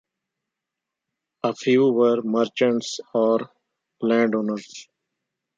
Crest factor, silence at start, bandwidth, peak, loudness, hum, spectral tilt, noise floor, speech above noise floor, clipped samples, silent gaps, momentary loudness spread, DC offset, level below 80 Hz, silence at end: 18 dB; 1.45 s; 7.8 kHz; -6 dBFS; -22 LUFS; none; -5.5 dB/octave; -85 dBFS; 64 dB; under 0.1%; none; 12 LU; under 0.1%; -76 dBFS; 0.75 s